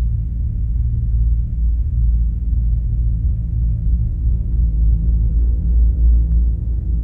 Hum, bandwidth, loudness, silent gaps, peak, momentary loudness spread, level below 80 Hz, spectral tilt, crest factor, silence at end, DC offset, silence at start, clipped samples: none; 0.7 kHz; -19 LUFS; none; -6 dBFS; 5 LU; -16 dBFS; -13 dB/octave; 10 dB; 0 s; under 0.1%; 0 s; under 0.1%